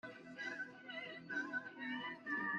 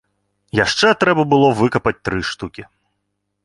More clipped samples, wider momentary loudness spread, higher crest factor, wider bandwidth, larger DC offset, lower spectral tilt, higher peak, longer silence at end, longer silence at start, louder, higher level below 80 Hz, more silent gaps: neither; second, 6 LU vs 11 LU; about the same, 16 dB vs 16 dB; second, 9.6 kHz vs 11.5 kHz; neither; about the same, -4.5 dB/octave vs -5 dB/octave; second, -30 dBFS vs -2 dBFS; second, 0 s vs 0.8 s; second, 0.05 s vs 0.55 s; second, -45 LUFS vs -16 LUFS; second, -88 dBFS vs -44 dBFS; neither